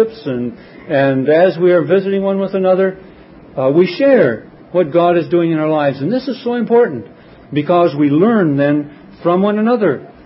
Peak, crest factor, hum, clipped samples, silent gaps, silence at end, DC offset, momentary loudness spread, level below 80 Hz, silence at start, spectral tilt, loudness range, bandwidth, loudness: 0 dBFS; 14 dB; none; under 0.1%; none; 0.2 s; under 0.1%; 9 LU; -56 dBFS; 0 s; -11.5 dB/octave; 1 LU; 5.8 kHz; -14 LUFS